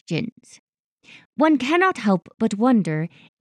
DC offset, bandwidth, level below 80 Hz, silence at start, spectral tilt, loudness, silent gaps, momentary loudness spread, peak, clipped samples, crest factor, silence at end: under 0.1%; 11 kHz; -70 dBFS; 0.1 s; -6.5 dB/octave; -20 LUFS; 0.32-0.36 s, 0.59-0.73 s, 0.79-0.97 s, 1.25-1.33 s; 14 LU; -4 dBFS; under 0.1%; 18 dB; 0.35 s